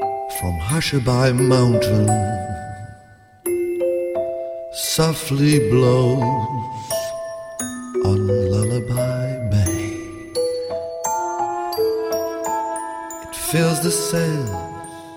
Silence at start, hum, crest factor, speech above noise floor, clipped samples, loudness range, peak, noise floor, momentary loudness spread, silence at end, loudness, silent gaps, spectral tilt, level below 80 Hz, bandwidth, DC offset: 0 s; none; 16 dB; 29 dB; under 0.1%; 4 LU; -4 dBFS; -47 dBFS; 13 LU; 0 s; -20 LUFS; none; -5.5 dB/octave; -44 dBFS; 16.5 kHz; under 0.1%